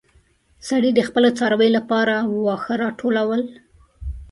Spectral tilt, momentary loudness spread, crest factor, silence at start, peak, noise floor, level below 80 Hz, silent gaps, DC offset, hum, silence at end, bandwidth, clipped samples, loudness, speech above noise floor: -5.5 dB/octave; 17 LU; 18 dB; 0.65 s; -2 dBFS; -58 dBFS; -42 dBFS; none; under 0.1%; none; 0.05 s; 11.5 kHz; under 0.1%; -19 LUFS; 39 dB